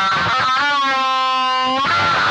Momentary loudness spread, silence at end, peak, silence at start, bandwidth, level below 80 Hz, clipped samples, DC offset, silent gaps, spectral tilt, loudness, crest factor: 2 LU; 0 s; -8 dBFS; 0 s; 10 kHz; -52 dBFS; under 0.1%; under 0.1%; none; -2.5 dB/octave; -16 LUFS; 8 dB